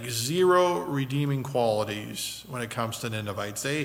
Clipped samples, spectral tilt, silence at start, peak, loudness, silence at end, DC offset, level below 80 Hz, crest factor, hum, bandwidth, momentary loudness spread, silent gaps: under 0.1%; -4.5 dB/octave; 0 s; -10 dBFS; -27 LUFS; 0 s; under 0.1%; -62 dBFS; 18 dB; none; 16.5 kHz; 11 LU; none